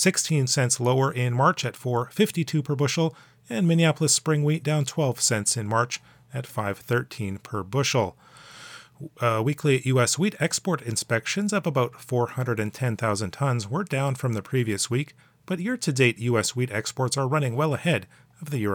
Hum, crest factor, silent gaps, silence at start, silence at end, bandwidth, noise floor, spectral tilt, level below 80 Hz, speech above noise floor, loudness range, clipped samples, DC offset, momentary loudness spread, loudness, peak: none; 18 dB; none; 0 s; 0 s; over 20 kHz; -45 dBFS; -4.5 dB/octave; -68 dBFS; 21 dB; 4 LU; under 0.1%; under 0.1%; 10 LU; -25 LUFS; -6 dBFS